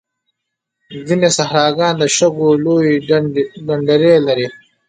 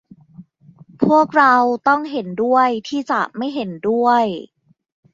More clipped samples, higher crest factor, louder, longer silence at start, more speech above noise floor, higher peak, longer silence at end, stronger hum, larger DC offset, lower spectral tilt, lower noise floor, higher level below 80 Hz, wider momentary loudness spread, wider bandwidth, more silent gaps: neither; about the same, 14 dB vs 18 dB; first, -14 LUFS vs -17 LUFS; first, 0.9 s vs 0.4 s; first, 64 dB vs 30 dB; about the same, 0 dBFS vs 0 dBFS; second, 0.35 s vs 0.7 s; neither; neither; second, -4.5 dB/octave vs -6 dB/octave; first, -77 dBFS vs -47 dBFS; about the same, -58 dBFS vs -62 dBFS; second, 8 LU vs 11 LU; first, 9.6 kHz vs 7.6 kHz; neither